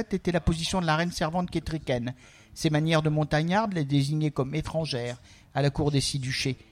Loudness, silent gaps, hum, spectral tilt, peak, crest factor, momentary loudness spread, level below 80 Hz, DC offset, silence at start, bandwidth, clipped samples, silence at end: -27 LUFS; none; none; -5.5 dB/octave; -10 dBFS; 18 dB; 8 LU; -44 dBFS; under 0.1%; 0 s; 14.5 kHz; under 0.1%; 0.15 s